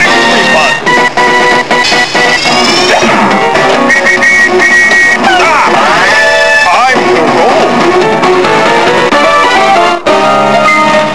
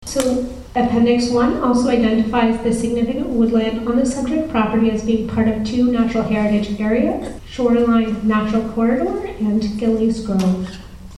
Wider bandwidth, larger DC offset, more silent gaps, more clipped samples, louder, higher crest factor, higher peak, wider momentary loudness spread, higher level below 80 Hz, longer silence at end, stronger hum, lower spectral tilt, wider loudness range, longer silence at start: about the same, 11 kHz vs 12 kHz; first, 4% vs under 0.1%; neither; first, 2% vs under 0.1%; first, -5 LUFS vs -18 LUFS; second, 6 dB vs 16 dB; about the same, 0 dBFS vs 0 dBFS; about the same, 3 LU vs 5 LU; about the same, -40 dBFS vs -38 dBFS; about the same, 0 s vs 0 s; neither; second, -3 dB/octave vs -6 dB/octave; about the same, 2 LU vs 1 LU; about the same, 0 s vs 0 s